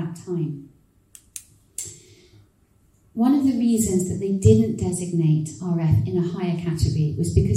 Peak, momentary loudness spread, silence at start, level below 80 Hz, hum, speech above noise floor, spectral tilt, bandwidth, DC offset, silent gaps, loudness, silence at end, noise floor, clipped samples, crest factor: -2 dBFS; 18 LU; 0 s; -40 dBFS; none; 39 dB; -7.5 dB/octave; 16 kHz; under 0.1%; none; -22 LUFS; 0 s; -60 dBFS; under 0.1%; 20 dB